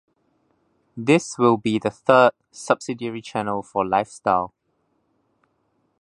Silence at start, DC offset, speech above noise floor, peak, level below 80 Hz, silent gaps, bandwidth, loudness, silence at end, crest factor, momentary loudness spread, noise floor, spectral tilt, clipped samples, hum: 0.95 s; under 0.1%; 49 dB; -2 dBFS; -62 dBFS; none; 11 kHz; -21 LUFS; 1.55 s; 22 dB; 13 LU; -69 dBFS; -5.5 dB/octave; under 0.1%; none